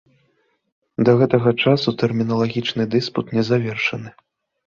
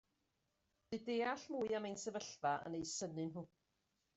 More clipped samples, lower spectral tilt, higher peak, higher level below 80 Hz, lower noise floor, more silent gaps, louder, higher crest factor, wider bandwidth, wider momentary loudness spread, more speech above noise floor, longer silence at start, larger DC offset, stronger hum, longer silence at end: neither; first, -7 dB/octave vs -4 dB/octave; first, -2 dBFS vs -28 dBFS; first, -56 dBFS vs -80 dBFS; second, -65 dBFS vs -85 dBFS; neither; first, -19 LUFS vs -43 LUFS; about the same, 18 dB vs 18 dB; second, 7.2 kHz vs 8.2 kHz; about the same, 7 LU vs 8 LU; first, 47 dB vs 42 dB; about the same, 1 s vs 0.9 s; neither; neither; about the same, 0.6 s vs 0.7 s